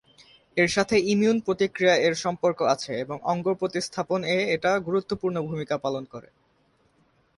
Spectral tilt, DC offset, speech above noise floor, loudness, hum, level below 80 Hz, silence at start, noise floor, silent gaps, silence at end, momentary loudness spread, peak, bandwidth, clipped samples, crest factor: -4.5 dB/octave; under 0.1%; 41 dB; -25 LUFS; none; -62 dBFS; 0.55 s; -65 dBFS; none; 1.15 s; 9 LU; -8 dBFS; 11.5 kHz; under 0.1%; 18 dB